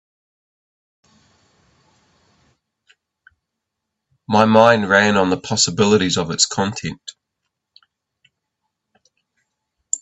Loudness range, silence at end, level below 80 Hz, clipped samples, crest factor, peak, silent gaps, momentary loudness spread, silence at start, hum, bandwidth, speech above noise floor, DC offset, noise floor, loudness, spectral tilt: 11 LU; 0.05 s; -58 dBFS; under 0.1%; 22 dB; 0 dBFS; none; 16 LU; 4.3 s; none; 8.4 kHz; 64 dB; under 0.1%; -80 dBFS; -16 LUFS; -3.5 dB/octave